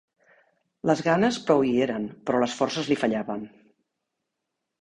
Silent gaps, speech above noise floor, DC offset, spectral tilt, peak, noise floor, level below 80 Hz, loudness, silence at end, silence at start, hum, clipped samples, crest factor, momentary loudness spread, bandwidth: none; 59 dB; under 0.1%; -5.5 dB/octave; -6 dBFS; -83 dBFS; -64 dBFS; -25 LUFS; 1.35 s; 0.85 s; none; under 0.1%; 20 dB; 10 LU; 10.5 kHz